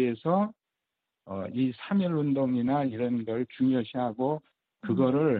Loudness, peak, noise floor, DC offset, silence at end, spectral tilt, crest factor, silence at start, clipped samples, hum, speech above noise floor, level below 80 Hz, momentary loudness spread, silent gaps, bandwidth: -29 LUFS; -12 dBFS; -86 dBFS; under 0.1%; 0 s; -11 dB/octave; 16 dB; 0 s; under 0.1%; none; 59 dB; -70 dBFS; 8 LU; none; 4.6 kHz